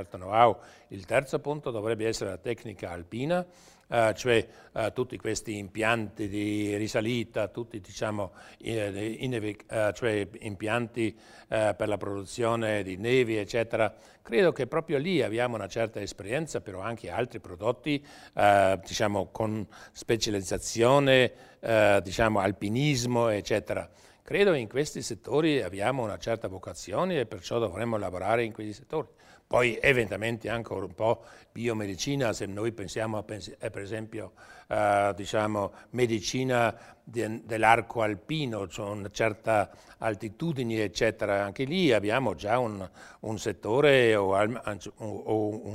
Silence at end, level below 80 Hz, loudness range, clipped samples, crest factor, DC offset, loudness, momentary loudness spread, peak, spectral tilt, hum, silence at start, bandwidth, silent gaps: 0 s; -56 dBFS; 6 LU; under 0.1%; 24 dB; under 0.1%; -29 LUFS; 13 LU; -4 dBFS; -5 dB/octave; none; 0 s; 16 kHz; none